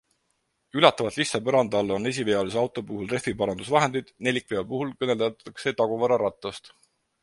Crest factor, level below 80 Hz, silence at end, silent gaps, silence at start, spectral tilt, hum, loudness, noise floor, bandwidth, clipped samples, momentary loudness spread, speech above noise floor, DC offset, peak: 24 dB; -60 dBFS; 0.55 s; none; 0.75 s; -4.5 dB/octave; none; -25 LUFS; -74 dBFS; 11.5 kHz; under 0.1%; 10 LU; 49 dB; under 0.1%; -2 dBFS